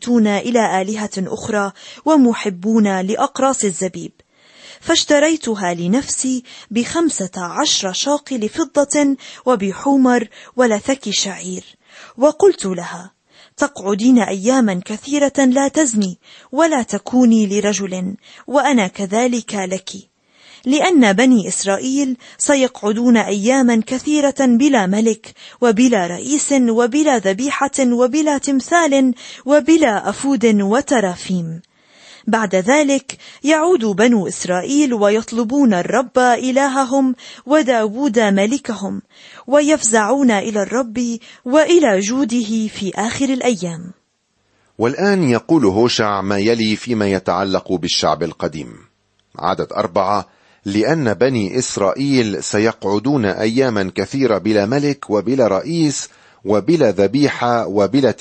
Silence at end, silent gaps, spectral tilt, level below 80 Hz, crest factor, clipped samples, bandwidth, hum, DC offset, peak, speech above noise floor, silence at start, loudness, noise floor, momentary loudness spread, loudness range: 0.05 s; none; -4.5 dB/octave; -56 dBFS; 14 dB; under 0.1%; 8.8 kHz; none; under 0.1%; -2 dBFS; 49 dB; 0 s; -16 LUFS; -65 dBFS; 10 LU; 3 LU